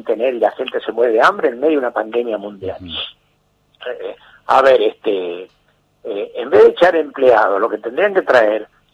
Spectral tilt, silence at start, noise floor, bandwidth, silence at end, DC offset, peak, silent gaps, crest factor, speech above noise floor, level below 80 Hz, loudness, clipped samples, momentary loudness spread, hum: -5 dB/octave; 0.05 s; -60 dBFS; 8.8 kHz; 0.3 s; under 0.1%; -2 dBFS; none; 14 dB; 45 dB; -56 dBFS; -15 LUFS; under 0.1%; 17 LU; 50 Hz at -65 dBFS